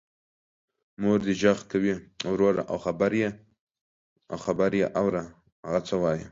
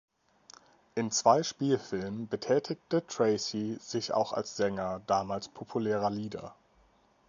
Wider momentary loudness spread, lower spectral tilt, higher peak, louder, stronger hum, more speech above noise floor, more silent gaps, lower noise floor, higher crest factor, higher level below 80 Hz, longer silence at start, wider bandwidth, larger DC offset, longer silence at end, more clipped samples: about the same, 9 LU vs 10 LU; first, -6.5 dB/octave vs -4.5 dB/octave; about the same, -8 dBFS vs -10 dBFS; first, -27 LUFS vs -31 LUFS; neither; first, over 64 dB vs 35 dB; first, 3.60-3.67 s, 3.81-4.16 s, 5.52-5.63 s vs none; first, under -90 dBFS vs -66 dBFS; about the same, 20 dB vs 22 dB; first, -58 dBFS vs -66 dBFS; about the same, 1 s vs 0.95 s; about the same, 7.8 kHz vs 7.6 kHz; neither; second, 0 s vs 0.75 s; neither